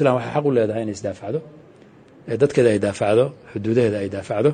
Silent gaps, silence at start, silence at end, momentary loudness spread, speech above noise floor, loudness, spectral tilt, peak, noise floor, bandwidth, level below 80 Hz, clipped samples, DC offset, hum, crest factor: none; 0 s; 0 s; 11 LU; 28 dB; -21 LUFS; -7 dB/octave; -4 dBFS; -48 dBFS; 9.6 kHz; -58 dBFS; under 0.1%; under 0.1%; none; 16 dB